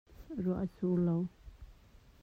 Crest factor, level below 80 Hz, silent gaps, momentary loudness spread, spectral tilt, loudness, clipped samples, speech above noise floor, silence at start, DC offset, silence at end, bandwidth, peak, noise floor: 14 dB; -56 dBFS; none; 10 LU; -11 dB/octave; -35 LUFS; under 0.1%; 27 dB; 0.2 s; under 0.1%; 0.25 s; 4.7 kHz; -22 dBFS; -60 dBFS